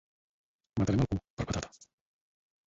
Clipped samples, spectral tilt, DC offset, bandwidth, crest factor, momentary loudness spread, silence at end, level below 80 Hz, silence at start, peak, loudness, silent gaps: under 0.1%; -6.5 dB/octave; under 0.1%; 8 kHz; 20 dB; 10 LU; 1 s; -48 dBFS; 0.75 s; -16 dBFS; -33 LUFS; 1.30-1.37 s